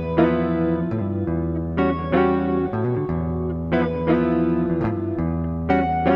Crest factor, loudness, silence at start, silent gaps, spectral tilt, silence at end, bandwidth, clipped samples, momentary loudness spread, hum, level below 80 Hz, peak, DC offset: 16 dB; -22 LUFS; 0 s; none; -10.5 dB/octave; 0 s; 5.4 kHz; under 0.1%; 5 LU; none; -38 dBFS; -4 dBFS; under 0.1%